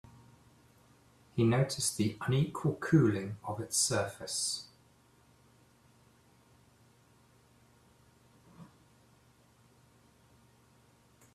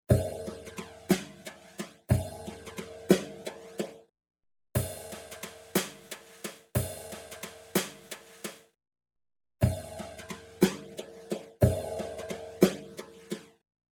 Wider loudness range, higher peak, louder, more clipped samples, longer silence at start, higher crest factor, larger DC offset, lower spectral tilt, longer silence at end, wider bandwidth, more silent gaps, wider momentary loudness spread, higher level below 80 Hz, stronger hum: first, 11 LU vs 6 LU; second, -14 dBFS vs -6 dBFS; about the same, -32 LUFS vs -33 LUFS; neither; first, 1.35 s vs 0.1 s; about the same, 22 dB vs 26 dB; neither; about the same, -4.5 dB/octave vs -5.5 dB/octave; first, 2.7 s vs 0.5 s; second, 14 kHz vs 19 kHz; neither; second, 13 LU vs 16 LU; second, -68 dBFS vs -50 dBFS; neither